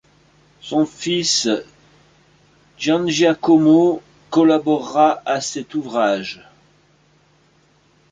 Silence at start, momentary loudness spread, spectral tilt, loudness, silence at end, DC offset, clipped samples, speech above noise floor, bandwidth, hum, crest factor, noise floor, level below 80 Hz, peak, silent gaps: 0.65 s; 11 LU; -4 dB/octave; -17 LUFS; 1.8 s; under 0.1%; under 0.1%; 40 dB; 9.4 kHz; none; 16 dB; -57 dBFS; -62 dBFS; -2 dBFS; none